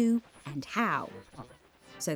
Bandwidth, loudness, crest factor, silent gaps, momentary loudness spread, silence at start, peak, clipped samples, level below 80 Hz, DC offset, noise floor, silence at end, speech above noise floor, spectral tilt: over 20 kHz; -33 LUFS; 18 dB; none; 21 LU; 0 s; -14 dBFS; under 0.1%; -68 dBFS; under 0.1%; -56 dBFS; 0 s; 26 dB; -5 dB/octave